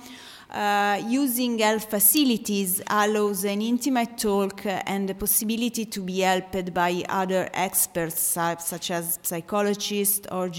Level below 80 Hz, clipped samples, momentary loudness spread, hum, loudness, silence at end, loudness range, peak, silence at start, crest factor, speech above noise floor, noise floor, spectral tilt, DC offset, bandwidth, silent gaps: -58 dBFS; under 0.1%; 6 LU; none; -24 LUFS; 0 s; 3 LU; -6 dBFS; 0 s; 20 dB; 20 dB; -44 dBFS; -3 dB/octave; under 0.1%; 17 kHz; none